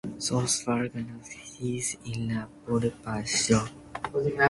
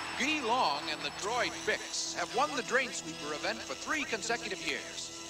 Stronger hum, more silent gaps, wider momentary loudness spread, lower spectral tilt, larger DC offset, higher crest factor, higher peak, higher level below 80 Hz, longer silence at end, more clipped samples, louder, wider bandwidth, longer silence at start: neither; neither; first, 13 LU vs 6 LU; first, -4 dB/octave vs -1.5 dB/octave; neither; about the same, 20 dB vs 18 dB; first, -8 dBFS vs -16 dBFS; first, -54 dBFS vs -66 dBFS; about the same, 0 s vs 0 s; neither; first, -29 LUFS vs -33 LUFS; second, 11.5 kHz vs 16 kHz; about the same, 0.05 s vs 0 s